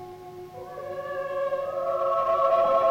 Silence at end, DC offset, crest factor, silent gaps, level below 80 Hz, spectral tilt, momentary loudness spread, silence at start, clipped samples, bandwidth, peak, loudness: 0 s; under 0.1%; 14 dB; none; -62 dBFS; -5.5 dB/octave; 20 LU; 0 s; under 0.1%; 16 kHz; -12 dBFS; -26 LUFS